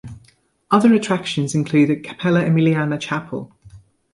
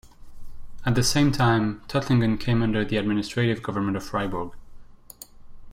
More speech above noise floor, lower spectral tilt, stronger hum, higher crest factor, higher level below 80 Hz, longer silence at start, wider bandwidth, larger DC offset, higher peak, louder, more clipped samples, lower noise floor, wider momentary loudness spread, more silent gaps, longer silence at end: first, 38 dB vs 23 dB; about the same, -6.5 dB/octave vs -5.5 dB/octave; neither; about the same, 18 dB vs 16 dB; second, -56 dBFS vs -42 dBFS; second, 0.05 s vs 0.2 s; second, 11.5 kHz vs 16 kHz; neither; first, -2 dBFS vs -10 dBFS; first, -18 LUFS vs -24 LUFS; neither; first, -55 dBFS vs -46 dBFS; second, 10 LU vs 13 LU; neither; first, 0.35 s vs 0 s